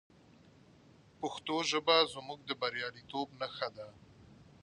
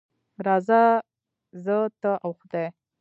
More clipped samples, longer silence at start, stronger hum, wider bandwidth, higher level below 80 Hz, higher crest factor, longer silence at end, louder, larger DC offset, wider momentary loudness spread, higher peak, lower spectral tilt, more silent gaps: neither; first, 1.2 s vs 0.4 s; neither; first, 10 kHz vs 7.6 kHz; first, -72 dBFS vs -80 dBFS; about the same, 22 dB vs 18 dB; about the same, 0.2 s vs 0.3 s; second, -34 LUFS vs -24 LUFS; neither; first, 15 LU vs 12 LU; second, -14 dBFS vs -6 dBFS; second, -2.5 dB/octave vs -8.5 dB/octave; neither